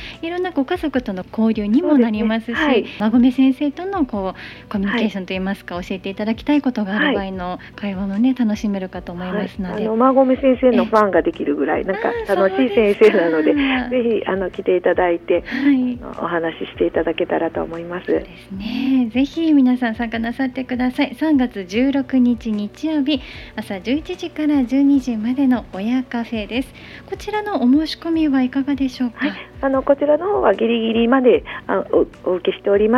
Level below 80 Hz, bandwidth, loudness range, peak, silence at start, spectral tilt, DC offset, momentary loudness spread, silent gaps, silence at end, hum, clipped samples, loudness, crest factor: -44 dBFS; 12 kHz; 5 LU; 0 dBFS; 0 s; -7 dB/octave; under 0.1%; 11 LU; none; 0 s; none; under 0.1%; -19 LUFS; 18 dB